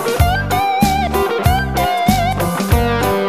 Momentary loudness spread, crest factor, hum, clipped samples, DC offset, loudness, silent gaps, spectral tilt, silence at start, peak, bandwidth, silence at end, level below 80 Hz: 2 LU; 14 dB; none; under 0.1%; 0.4%; -15 LUFS; none; -5.5 dB/octave; 0 s; 0 dBFS; 15.5 kHz; 0 s; -24 dBFS